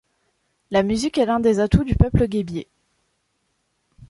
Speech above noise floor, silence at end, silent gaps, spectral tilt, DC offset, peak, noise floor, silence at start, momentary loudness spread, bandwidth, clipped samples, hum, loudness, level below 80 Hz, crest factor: 52 dB; 0.05 s; none; -7 dB/octave; under 0.1%; -2 dBFS; -71 dBFS; 0.7 s; 8 LU; 11.5 kHz; under 0.1%; none; -20 LUFS; -32 dBFS; 20 dB